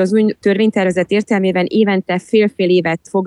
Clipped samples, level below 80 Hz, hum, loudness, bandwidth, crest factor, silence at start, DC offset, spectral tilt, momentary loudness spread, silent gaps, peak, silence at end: under 0.1%; -58 dBFS; none; -15 LUFS; 11 kHz; 12 dB; 0 s; under 0.1%; -6.5 dB/octave; 2 LU; none; -2 dBFS; 0 s